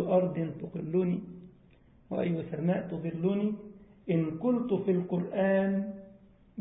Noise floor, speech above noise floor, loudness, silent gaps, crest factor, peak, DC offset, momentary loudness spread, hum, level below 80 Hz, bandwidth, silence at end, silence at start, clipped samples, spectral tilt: -60 dBFS; 30 dB; -31 LUFS; none; 16 dB; -14 dBFS; under 0.1%; 16 LU; none; -64 dBFS; 3.9 kHz; 0 s; 0 s; under 0.1%; -12 dB/octave